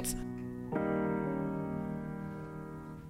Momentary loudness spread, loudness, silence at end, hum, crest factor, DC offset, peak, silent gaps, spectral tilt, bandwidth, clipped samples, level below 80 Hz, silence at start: 11 LU; -37 LUFS; 0 s; none; 16 dB; under 0.1%; -22 dBFS; none; -6 dB/octave; 16.5 kHz; under 0.1%; -54 dBFS; 0 s